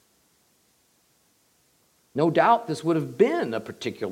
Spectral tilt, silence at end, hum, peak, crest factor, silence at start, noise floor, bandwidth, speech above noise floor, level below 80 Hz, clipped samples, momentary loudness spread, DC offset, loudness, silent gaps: -6.5 dB/octave; 0 s; none; -6 dBFS; 20 dB; 2.15 s; -65 dBFS; 16 kHz; 42 dB; -76 dBFS; under 0.1%; 12 LU; under 0.1%; -24 LUFS; none